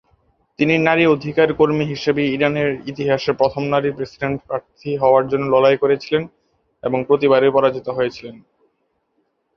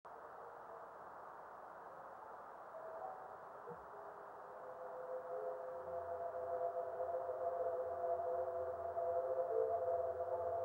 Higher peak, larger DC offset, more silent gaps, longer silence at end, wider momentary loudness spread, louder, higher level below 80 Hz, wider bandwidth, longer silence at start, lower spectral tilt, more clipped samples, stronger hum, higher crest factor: first, 0 dBFS vs -28 dBFS; neither; neither; first, 1.2 s vs 0 s; second, 11 LU vs 14 LU; first, -18 LUFS vs -45 LUFS; first, -54 dBFS vs -78 dBFS; second, 6.6 kHz vs 16 kHz; first, 0.6 s vs 0.05 s; about the same, -7 dB/octave vs -7 dB/octave; neither; neither; about the same, 18 dB vs 16 dB